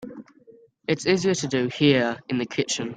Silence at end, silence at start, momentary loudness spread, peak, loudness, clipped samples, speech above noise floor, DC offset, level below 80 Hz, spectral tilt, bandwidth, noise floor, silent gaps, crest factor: 0 s; 0 s; 9 LU; -4 dBFS; -23 LUFS; under 0.1%; 30 dB; under 0.1%; -62 dBFS; -4.5 dB/octave; 9.6 kHz; -53 dBFS; none; 20 dB